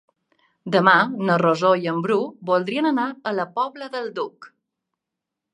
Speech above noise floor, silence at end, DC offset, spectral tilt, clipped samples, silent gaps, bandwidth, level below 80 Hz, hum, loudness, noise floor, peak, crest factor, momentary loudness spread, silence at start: 63 dB; 1.05 s; under 0.1%; -6.5 dB/octave; under 0.1%; none; 11 kHz; -74 dBFS; none; -21 LUFS; -84 dBFS; 0 dBFS; 22 dB; 13 LU; 0.65 s